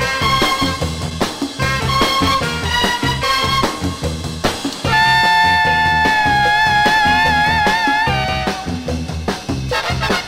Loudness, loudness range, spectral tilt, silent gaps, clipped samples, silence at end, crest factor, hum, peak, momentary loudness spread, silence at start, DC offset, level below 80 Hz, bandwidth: -15 LUFS; 4 LU; -3.5 dB/octave; none; under 0.1%; 0 s; 14 dB; none; -2 dBFS; 10 LU; 0 s; under 0.1%; -32 dBFS; 16 kHz